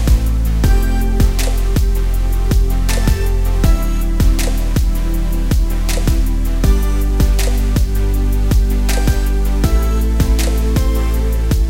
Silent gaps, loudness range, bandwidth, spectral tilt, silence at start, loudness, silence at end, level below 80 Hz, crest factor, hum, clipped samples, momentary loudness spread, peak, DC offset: none; 1 LU; 16.5 kHz; -5.5 dB/octave; 0 s; -17 LUFS; 0 s; -14 dBFS; 12 dB; none; under 0.1%; 3 LU; -2 dBFS; 2%